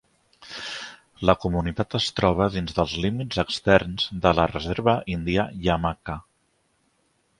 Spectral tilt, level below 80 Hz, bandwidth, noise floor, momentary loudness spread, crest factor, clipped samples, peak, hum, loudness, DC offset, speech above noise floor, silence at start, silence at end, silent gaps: -6 dB/octave; -42 dBFS; 11.5 kHz; -68 dBFS; 14 LU; 24 dB; under 0.1%; 0 dBFS; none; -24 LUFS; under 0.1%; 45 dB; 0.4 s; 1.2 s; none